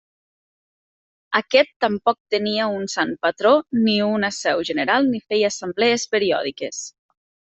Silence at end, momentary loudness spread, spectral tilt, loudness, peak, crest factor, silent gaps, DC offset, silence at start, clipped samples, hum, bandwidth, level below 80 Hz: 0.6 s; 6 LU; -3.5 dB/octave; -20 LUFS; -2 dBFS; 18 dB; 1.76-1.80 s, 2.20-2.25 s; under 0.1%; 1.3 s; under 0.1%; none; 8.4 kHz; -64 dBFS